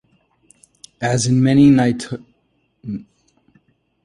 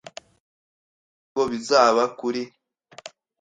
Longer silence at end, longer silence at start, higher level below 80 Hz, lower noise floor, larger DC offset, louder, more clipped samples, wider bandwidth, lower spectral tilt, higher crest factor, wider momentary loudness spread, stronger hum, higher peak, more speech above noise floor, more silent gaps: first, 1.05 s vs 0.35 s; second, 1 s vs 1.35 s; first, -52 dBFS vs -66 dBFS; first, -65 dBFS vs -47 dBFS; neither; first, -15 LUFS vs -22 LUFS; neither; first, 11 kHz vs 9.4 kHz; first, -6 dB/octave vs -3 dB/octave; second, 16 dB vs 22 dB; second, 20 LU vs 25 LU; neither; about the same, -2 dBFS vs -4 dBFS; first, 50 dB vs 26 dB; neither